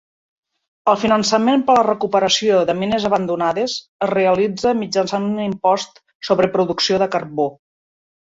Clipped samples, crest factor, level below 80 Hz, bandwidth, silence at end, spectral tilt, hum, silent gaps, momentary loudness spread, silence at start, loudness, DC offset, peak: under 0.1%; 16 dB; -56 dBFS; 8 kHz; 0.85 s; -4.5 dB/octave; none; 3.88-3.99 s, 6.15-6.20 s; 7 LU; 0.85 s; -18 LUFS; under 0.1%; -2 dBFS